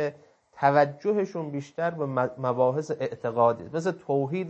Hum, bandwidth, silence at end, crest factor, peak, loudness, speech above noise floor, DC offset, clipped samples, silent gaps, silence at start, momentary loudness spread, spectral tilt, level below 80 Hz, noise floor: none; 8.4 kHz; 0 s; 20 dB; -6 dBFS; -27 LUFS; 26 dB; under 0.1%; under 0.1%; none; 0 s; 8 LU; -7.5 dB/octave; -72 dBFS; -52 dBFS